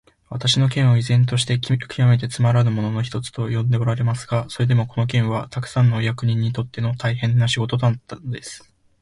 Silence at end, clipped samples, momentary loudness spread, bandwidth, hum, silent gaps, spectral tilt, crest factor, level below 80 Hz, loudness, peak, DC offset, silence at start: 0.45 s; under 0.1%; 9 LU; 11.5 kHz; none; none; -6 dB/octave; 16 dB; -50 dBFS; -20 LUFS; -4 dBFS; under 0.1%; 0.3 s